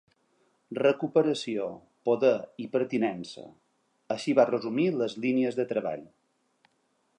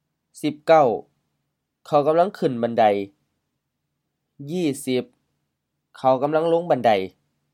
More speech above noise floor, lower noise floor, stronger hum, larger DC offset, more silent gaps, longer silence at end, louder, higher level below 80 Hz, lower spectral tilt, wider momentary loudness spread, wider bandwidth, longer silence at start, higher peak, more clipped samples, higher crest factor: second, 45 dB vs 58 dB; second, -73 dBFS vs -78 dBFS; neither; neither; neither; first, 1.1 s vs 0.45 s; second, -28 LUFS vs -21 LUFS; about the same, -78 dBFS vs -76 dBFS; about the same, -6 dB/octave vs -6 dB/octave; about the same, 13 LU vs 13 LU; second, 10.5 kHz vs 15.5 kHz; first, 0.7 s vs 0.35 s; second, -8 dBFS vs -4 dBFS; neither; about the same, 22 dB vs 20 dB